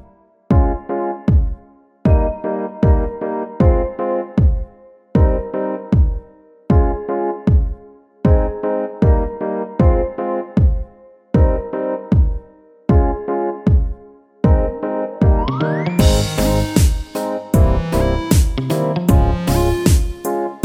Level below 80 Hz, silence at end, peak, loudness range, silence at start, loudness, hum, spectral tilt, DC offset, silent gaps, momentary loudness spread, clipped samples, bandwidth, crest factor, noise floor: -20 dBFS; 0.05 s; -2 dBFS; 2 LU; 0.5 s; -18 LUFS; none; -7 dB/octave; under 0.1%; none; 8 LU; under 0.1%; 16 kHz; 14 dB; -48 dBFS